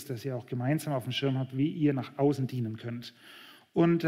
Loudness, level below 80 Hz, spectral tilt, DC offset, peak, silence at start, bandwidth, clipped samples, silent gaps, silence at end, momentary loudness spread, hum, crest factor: -31 LUFS; -76 dBFS; -7 dB/octave; under 0.1%; -14 dBFS; 0 s; 16 kHz; under 0.1%; none; 0 s; 16 LU; none; 16 dB